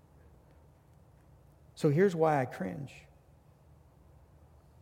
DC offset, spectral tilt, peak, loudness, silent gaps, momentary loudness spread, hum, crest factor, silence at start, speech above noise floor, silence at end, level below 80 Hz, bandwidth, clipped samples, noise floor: under 0.1%; -7.5 dB/octave; -14 dBFS; -30 LUFS; none; 24 LU; none; 20 dB; 1.75 s; 32 dB; 1.8 s; -64 dBFS; 16 kHz; under 0.1%; -61 dBFS